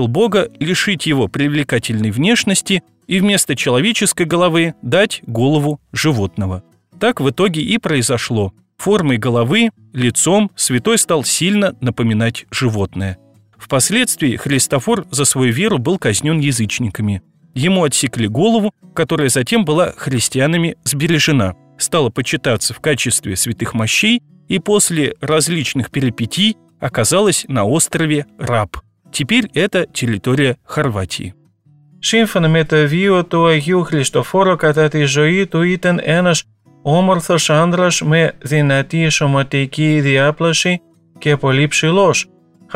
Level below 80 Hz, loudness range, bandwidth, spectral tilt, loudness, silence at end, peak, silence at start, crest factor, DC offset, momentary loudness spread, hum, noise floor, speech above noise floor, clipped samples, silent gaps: -48 dBFS; 3 LU; 16 kHz; -4.5 dB/octave; -15 LUFS; 0 s; -2 dBFS; 0 s; 12 dB; 0.3%; 6 LU; none; -50 dBFS; 36 dB; under 0.1%; none